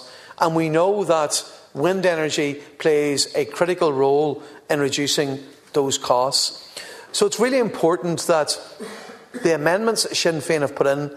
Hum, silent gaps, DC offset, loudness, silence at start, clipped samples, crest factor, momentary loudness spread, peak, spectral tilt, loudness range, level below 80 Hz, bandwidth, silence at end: none; none; under 0.1%; -20 LUFS; 0 s; under 0.1%; 18 dB; 15 LU; -4 dBFS; -3.5 dB/octave; 1 LU; -66 dBFS; 14 kHz; 0 s